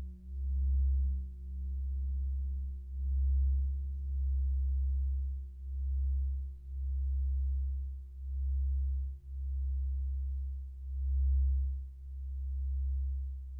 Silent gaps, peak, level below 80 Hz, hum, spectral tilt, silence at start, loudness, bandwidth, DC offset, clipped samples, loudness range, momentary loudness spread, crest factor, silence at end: none; -24 dBFS; -34 dBFS; none; -11 dB/octave; 0 s; -37 LUFS; 0.4 kHz; under 0.1%; under 0.1%; 2 LU; 11 LU; 8 dB; 0 s